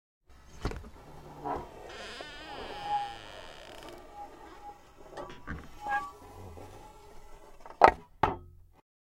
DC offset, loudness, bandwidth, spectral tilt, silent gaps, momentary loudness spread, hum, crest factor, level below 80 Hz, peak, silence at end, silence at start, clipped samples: under 0.1%; -33 LUFS; 16.5 kHz; -5 dB/octave; none; 20 LU; none; 36 dB; -52 dBFS; 0 dBFS; 0.6 s; 0.3 s; under 0.1%